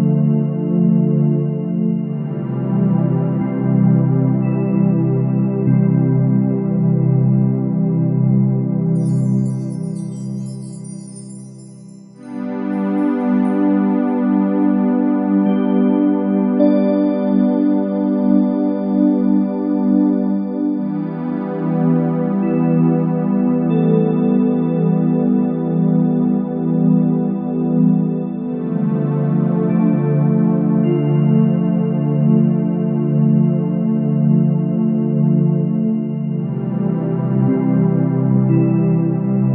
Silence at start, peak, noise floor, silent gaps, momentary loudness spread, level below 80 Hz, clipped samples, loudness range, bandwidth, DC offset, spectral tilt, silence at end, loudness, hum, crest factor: 0 s; -2 dBFS; -38 dBFS; none; 7 LU; -68 dBFS; under 0.1%; 3 LU; 10.5 kHz; under 0.1%; -11 dB/octave; 0 s; -16 LUFS; none; 14 dB